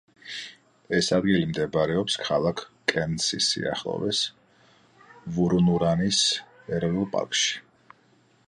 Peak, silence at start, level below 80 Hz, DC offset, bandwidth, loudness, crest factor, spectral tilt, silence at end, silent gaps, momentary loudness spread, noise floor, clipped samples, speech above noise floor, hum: -6 dBFS; 0.25 s; -54 dBFS; under 0.1%; 11 kHz; -25 LUFS; 20 dB; -4 dB/octave; 0.9 s; none; 12 LU; -61 dBFS; under 0.1%; 37 dB; none